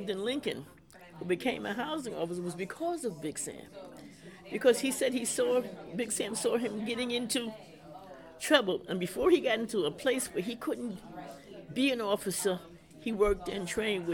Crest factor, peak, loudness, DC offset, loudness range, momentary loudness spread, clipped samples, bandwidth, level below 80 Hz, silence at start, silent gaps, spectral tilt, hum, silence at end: 22 dB; -10 dBFS; -32 LUFS; under 0.1%; 5 LU; 21 LU; under 0.1%; 19 kHz; -58 dBFS; 0 s; none; -3.5 dB/octave; none; 0 s